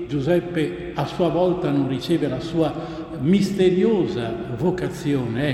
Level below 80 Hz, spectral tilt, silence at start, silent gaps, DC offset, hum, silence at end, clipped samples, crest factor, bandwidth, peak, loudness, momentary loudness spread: -46 dBFS; -7.5 dB/octave; 0 s; none; under 0.1%; none; 0 s; under 0.1%; 16 dB; 13.5 kHz; -6 dBFS; -22 LUFS; 8 LU